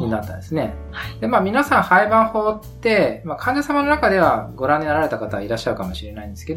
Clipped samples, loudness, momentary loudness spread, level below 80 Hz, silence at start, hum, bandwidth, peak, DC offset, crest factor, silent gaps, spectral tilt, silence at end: under 0.1%; -19 LUFS; 13 LU; -40 dBFS; 0 s; none; 16.5 kHz; 0 dBFS; under 0.1%; 18 dB; none; -6 dB/octave; 0 s